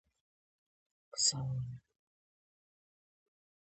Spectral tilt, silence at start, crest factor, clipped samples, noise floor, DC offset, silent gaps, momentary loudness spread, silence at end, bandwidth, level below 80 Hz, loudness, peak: -2.5 dB/octave; 1.15 s; 28 dB; under 0.1%; under -90 dBFS; under 0.1%; none; 16 LU; 2 s; 8.4 kHz; -68 dBFS; -33 LUFS; -16 dBFS